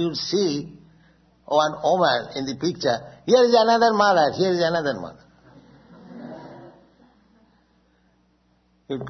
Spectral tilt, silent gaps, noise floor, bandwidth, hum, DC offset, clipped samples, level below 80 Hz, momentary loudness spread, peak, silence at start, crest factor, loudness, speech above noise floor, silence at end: -4.5 dB/octave; none; -63 dBFS; 6.4 kHz; none; under 0.1%; under 0.1%; -62 dBFS; 23 LU; -4 dBFS; 0 s; 20 dB; -21 LUFS; 43 dB; 0 s